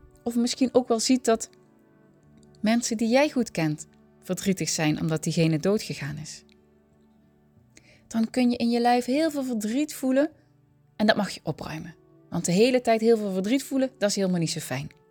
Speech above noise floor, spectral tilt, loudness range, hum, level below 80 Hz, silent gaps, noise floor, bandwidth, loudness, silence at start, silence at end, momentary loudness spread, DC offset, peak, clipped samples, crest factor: 36 dB; -5 dB/octave; 4 LU; none; -62 dBFS; none; -61 dBFS; 19.5 kHz; -25 LUFS; 0.25 s; 0.2 s; 12 LU; under 0.1%; -4 dBFS; under 0.1%; 22 dB